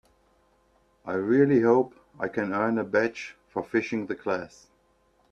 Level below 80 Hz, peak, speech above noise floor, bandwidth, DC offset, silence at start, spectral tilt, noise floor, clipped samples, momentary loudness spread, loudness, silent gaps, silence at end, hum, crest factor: -66 dBFS; -8 dBFS; 40 dB; 7.8 kHz; under 0.1%; 1.05 s; -7.5 dB/octave; -66 dBFS; under 0.1%; 14 LU; -26 LUFS; none; 0.85 s; none; 20 dB